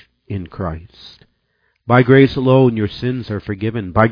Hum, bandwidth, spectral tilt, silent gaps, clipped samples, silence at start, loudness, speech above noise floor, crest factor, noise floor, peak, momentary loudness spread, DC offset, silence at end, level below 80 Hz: none; 5.2 kHz; -9.5 dB/octave; none; under 0.1%; 0.3 s; -15 LUFS; 50 dB; 16 dB; -65 dBFS; 0 dBFS; 17 LU; under 0.1%; 0 s; -42 dBFS